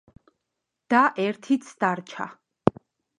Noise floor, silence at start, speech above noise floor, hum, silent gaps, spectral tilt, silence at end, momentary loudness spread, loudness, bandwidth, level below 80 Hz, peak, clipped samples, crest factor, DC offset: -82 dBFS; 0.9 s; 58 dB; none; none; -6 dB/octave; 0.5 s; 15 LU; -25 LUFS; 10.5 kHz; -60 dBFS; 0 dBFS; under 0.1%; 26 dB; under 0.1%